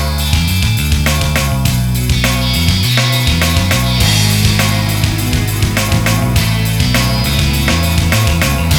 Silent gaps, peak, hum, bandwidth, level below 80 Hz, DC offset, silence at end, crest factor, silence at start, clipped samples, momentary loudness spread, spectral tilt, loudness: none; 0 dBFS; none; over 20 kHz; -20 dBFS; under 0.1%; 0 s; 12 dB; 0 s; under 0.1%; 3 LU; -4 dB/octave; -13 LUFS